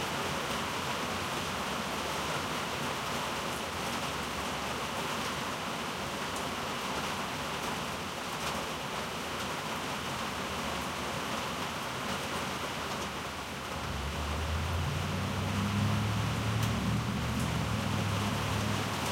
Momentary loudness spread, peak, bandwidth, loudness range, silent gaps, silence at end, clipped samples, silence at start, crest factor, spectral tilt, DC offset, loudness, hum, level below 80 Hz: 4 LU; -18 dBFS; 16 kHz; 3 LU; none; 0 s; under 0.1%; 0 s; 16 dB; -4 dB/octave; under 0.1%; -34 LUFS; none; -48 dBFS